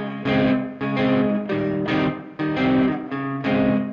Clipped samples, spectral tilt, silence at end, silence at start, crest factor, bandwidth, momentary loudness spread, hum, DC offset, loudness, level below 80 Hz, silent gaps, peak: under 0.1%; -8.5 dB/octave; 0 s; 0 s; 12 dB; 5.6 kHz; 6 LU; none; under 0.1%; -22 LUFS; -48 dBFS; none; -10 dBFS